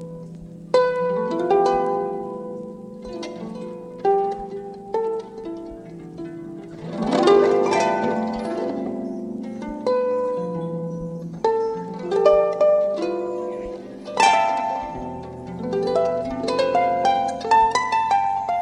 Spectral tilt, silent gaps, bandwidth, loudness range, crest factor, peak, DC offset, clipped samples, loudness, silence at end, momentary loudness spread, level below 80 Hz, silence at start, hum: -5 dB/octave; none; 11 kHz; 7 LU; 20 dB; -2 dBFS; under 0.1%; under 0.1%; -22 LUFS; 0 s; 17 LU; -52 dBFS; 0 s; none